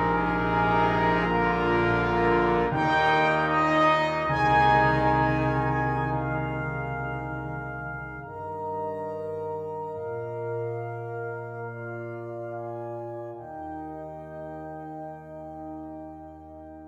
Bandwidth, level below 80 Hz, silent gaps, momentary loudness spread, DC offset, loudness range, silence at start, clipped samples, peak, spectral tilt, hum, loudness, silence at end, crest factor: 9.2 kHz; -44 dBFS; none; 17 LU; under 0.1%; 15 LU; 0 s; under 0.1%; -8 dBFS; -7.5 dB/octave; none; -26 LUFS; 0 s; 18 dB